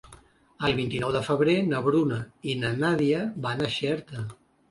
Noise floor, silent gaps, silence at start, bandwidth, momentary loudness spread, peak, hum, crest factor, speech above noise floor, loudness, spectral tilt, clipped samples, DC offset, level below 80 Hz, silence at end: -54 dBFS; none; 0.1 s; 11.5 kHz; 9 LU; -10 dBFS; none; 16 dB; 28 dB; -26 LUFS; -6.5 dB/octave; under 0.1%; under 0.1%; -56 dBFS; 0.35 s